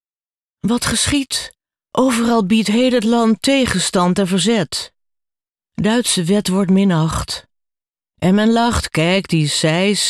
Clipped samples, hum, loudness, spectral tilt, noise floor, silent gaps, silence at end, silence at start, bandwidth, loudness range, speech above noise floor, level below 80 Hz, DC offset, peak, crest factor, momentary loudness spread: under 0.1%; none; -16 LUFS; -4.5 dB/octave; under -90 dBFS; none; 0 s; 0.65 s; 14 kHz; 3 LU; over 75 dB; -40 dBFS; under 0.1%; -4 dBFS; 14 dB; 9 LU